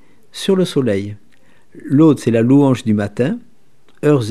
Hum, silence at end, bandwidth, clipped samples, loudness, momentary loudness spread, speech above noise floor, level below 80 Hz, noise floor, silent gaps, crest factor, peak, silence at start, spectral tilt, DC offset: none; 0 s; 13 kHz; under 0.1%; -15 LUFS; 15 LU; 42 dB; -62 dBFS; -55 dBFS; none; 16 dB; 0 dBFS; 0.35 s; -7.5 dB/octave; 0.9%